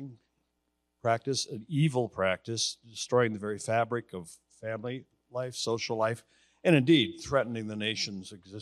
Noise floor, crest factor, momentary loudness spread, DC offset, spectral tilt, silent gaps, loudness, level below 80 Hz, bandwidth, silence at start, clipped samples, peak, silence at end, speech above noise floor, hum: -79 dBFS; 22 dB; 17 LU; under 0.1%; -5 dB/octave; none; -30 LUFS; -68 dBFS; 12.5 kHz; 0 s; under 0.1%; -10 dBFS; 0 s; 49 dB; none